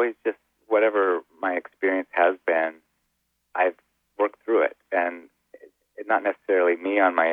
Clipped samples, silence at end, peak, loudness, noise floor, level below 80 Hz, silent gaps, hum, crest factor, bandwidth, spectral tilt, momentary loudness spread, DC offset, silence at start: under 0.1%; 0 s; -6 dBFS; -24 LUFS; -74 dBFS; -82 dBFS; none; none; 18 dB; 3.9 kHz; -6 dB/octave; 9 LU; under 0.1%; 0 s